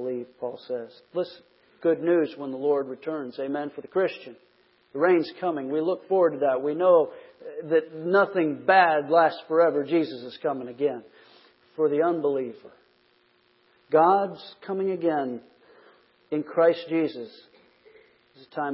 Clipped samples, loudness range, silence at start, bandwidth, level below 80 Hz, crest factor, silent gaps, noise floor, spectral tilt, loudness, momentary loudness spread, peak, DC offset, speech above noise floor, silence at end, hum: under 0.1%; 6 LU; 0 s; 5.8 kHz; -80 dBFS; 20 dB; none; -64 dBFS; -10 dB/octave; -25 LUFS; 15 LU; -6 dBFS; under 0.1%; 40 dB; 0 s; none